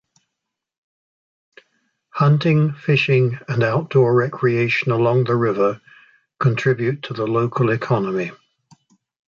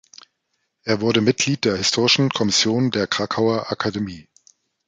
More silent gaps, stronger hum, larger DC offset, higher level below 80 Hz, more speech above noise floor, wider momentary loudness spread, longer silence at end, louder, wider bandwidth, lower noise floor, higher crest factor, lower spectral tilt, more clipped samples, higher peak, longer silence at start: neither; neither; neither; second, -60 dBFS vs -54 dBFS; first, 64 dB vs 54 dB; about the same, 7 LU vs 8 LU; first, 0.95 s vs 0.65 s; about the same, -19 LUFS vs -19 LUFS; second, 7 kHz vs 9.6 kHz; first, -82 dBFS vs -73 dBFS; about the same, 16 dB vs 18 dB; first, -8 dB/octave vs -4 dB/octave; neither; about the same, -4 dBFS vs -2 dBFS; first, 2.15 s vs 0.85 s